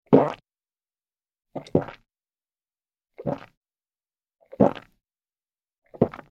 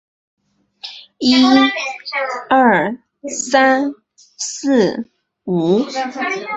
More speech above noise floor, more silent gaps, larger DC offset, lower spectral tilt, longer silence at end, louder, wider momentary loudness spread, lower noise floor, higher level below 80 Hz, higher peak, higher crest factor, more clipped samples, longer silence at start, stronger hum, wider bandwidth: first, over 66 dB vs 23 dB; first, 3.57-3.61 s, 5.78-5.82 s vs none; neither; first, -9.5 dB/octave vs -4 dB/octave; first, 0.15 s vs 0 s; second, -25 LUFS vs -16 LUFS; about the same, 20 LU vs 19 LU; first, under -90 dBFS vs -38 dBFS; about the same, -58 dBFS vs -60 dBFS; about the same, -2 dBFS vs -2 dBFS; first, 26 dB vs 16 dB; neither; second, 0.1 s vs 0.85 s; neither; second, 7.2 kHz vs 8.2 kHz